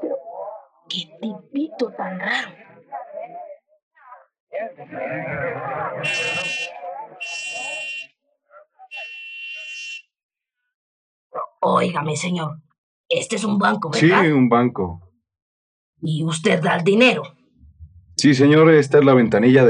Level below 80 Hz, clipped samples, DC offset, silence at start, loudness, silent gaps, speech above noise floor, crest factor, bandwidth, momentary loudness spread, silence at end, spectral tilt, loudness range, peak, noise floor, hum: -64 dBFS; under 0.1%; under 0.1%; 0 s; -19 LUFS; 3.82-3.91 s, 4.40-4.47 s, 10.23-10.29 s, 10.74-11.30 s, 12.78-13.04 s, 15.42-15.93 s; 39 dB; 20 dB; 10.5 kHz; 20 LU; 0 s; -5.5 dB/octave; 14 LU; -2 dBFS; -57 dBFS; none